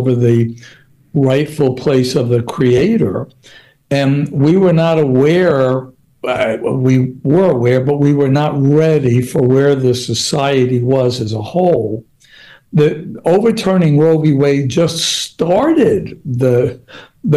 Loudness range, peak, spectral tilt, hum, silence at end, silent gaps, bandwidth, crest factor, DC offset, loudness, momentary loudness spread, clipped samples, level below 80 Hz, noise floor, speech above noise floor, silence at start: 3 LU; -2 dBFS; -6.5 dB/octave; none; 0 s; none; 12.5 kHz; 10 dB; under 0.1%; -13 LUFS; 8 LU; under 0.1%; -48 dBFS; -42 dBFS; 30 dB; 0 s